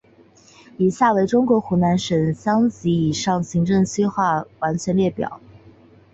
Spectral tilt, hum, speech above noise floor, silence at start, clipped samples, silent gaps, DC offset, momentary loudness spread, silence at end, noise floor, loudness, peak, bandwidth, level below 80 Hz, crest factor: -6.5 dB/octave; none; 32 dB; 0.8 s; under 0.1%; none; under 0.1%; 6 LU; 0.75 s; -51 dBFS; -20 LUFS; -6 dBFS; 8 kHz; -52 dBFS; 16 dB